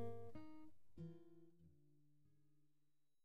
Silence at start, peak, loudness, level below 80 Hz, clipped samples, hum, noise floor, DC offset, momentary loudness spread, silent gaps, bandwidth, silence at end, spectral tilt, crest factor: 0 s; -38 dBFS; -60 LUFS; -80 dBFS; under 0.1%; none; -89 dBFS; under 0.1%; 11 LU; none; 14.5 kHz; 0 s; -8.5 dB/octave; 18 dB